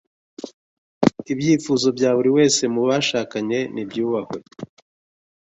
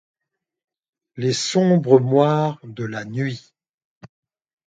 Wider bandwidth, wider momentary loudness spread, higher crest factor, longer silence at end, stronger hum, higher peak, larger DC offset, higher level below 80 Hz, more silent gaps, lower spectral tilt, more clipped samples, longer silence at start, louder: second, 8.4 kHz vs 9.4 kHz; first, 22 LU vs 14 LU; about the same, 22 dB vs 22 dB; first, 0.75 s vs 0.6 s; neither; about the same, 0 dBFS vs 0 dBFS; neither; about the same, -62 dBFS vs -66 dBFS; first, 0.53-1.01 s vs 3.69-3.78 s, 3.84-4.01 s; second, -4.5 dB/octave vs -6 dB/octave; neither; second, 0.4 s vs 1.15 s; about the same, -20 LUFS vs -19 LUFS